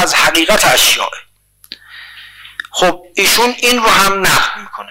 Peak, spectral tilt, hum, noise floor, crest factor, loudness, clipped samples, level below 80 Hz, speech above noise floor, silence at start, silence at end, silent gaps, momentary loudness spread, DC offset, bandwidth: 0 dBFS; -1 dB/octave; 50 Hz at -55 dBFS; -37 dBFS; 14 dB; -10 LUFS; under 0.1%; -38 dBFS; 26 dB; 0 s; 0.05 s; none; 20 LU; under 0.1%; 16.5 kHz